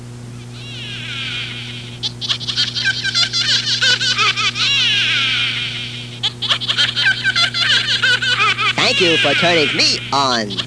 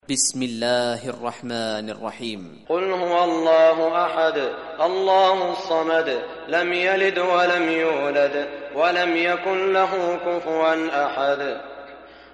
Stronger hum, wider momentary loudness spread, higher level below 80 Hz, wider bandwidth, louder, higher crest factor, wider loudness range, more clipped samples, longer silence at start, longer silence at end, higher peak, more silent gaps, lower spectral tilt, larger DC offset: first, 60 Hz at -35 dBFS vs none; about the same, 13 LU vs 12 LU; first, -48 dBFS vs -64 dBFS; about the same, 11 kHz vs 11.5 kHz; first, -14 LUFS vs -21 LUFS; about the same, 16 dB vs 16 dB; about the same, 5 LU vs 3 LU; neither; about the same, 0 s vs 0.1 s; second, 0 s vs 0.15 s; first, -2 dBFS vs -6 dBFS; neither; about the same, -2 dB/octave vs -3 dB/octave; first, 0.2% vs under 0.1%